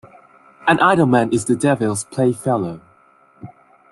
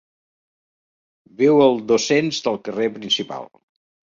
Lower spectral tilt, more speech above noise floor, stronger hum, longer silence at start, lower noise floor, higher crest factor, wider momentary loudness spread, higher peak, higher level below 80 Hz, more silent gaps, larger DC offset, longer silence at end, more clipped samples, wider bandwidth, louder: first, -5.5 dB/octave vs -4 dB/octave; second, 36 dB vs over 71 dB; neither; second, 0.65 s vs 1.4 s; second, -53 dBFS vs under -90 dBFS; about the same, 18 dB vs 18 dB; about the same, 9 LU vs 10 LU; about the same, -2 dBFS vs -4 dBFS; first, -56 dBFS vs -64 dBFS; neither; neither; second, 0.45 s vs 0.7 s; neither; first, 12.5 kHz vs 7.6 kHz; about the same, -17 LUFS vs -19 LUFS